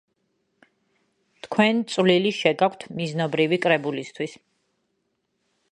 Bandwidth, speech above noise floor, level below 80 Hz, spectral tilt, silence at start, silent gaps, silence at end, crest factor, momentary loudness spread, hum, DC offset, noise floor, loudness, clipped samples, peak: 10.5 kHz; 52 dB; -72 dBFS; -5.5 dB/octave; 1.45 s; none; 1.35 s; 22 dB; 11 LU; none; under 0.1%; -74 dBFS; -23 LUFS; under 0.1%; -2 dBFS